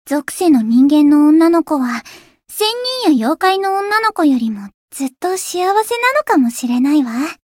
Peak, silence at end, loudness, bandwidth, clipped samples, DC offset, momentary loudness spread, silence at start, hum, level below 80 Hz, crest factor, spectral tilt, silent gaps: -2 dBFS; 0.2 s; -14 LUFS; 17 kHz; under 0.1%; under 0.1%; 12 LU; 0.05 s; none; -62 dBFS; 12 dB; -3.5 dB/octave; 4.74-4.88 s